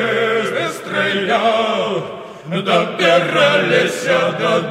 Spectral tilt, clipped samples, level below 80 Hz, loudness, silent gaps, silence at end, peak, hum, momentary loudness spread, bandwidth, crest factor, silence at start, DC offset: -4.5 dB/octave; under 0.1%; -64 dBFS; -16 LUFS; none; 0 s; -2 dBFS; none; 9 LU; 15 kHz; 14 dB; 0 s; under 0.1%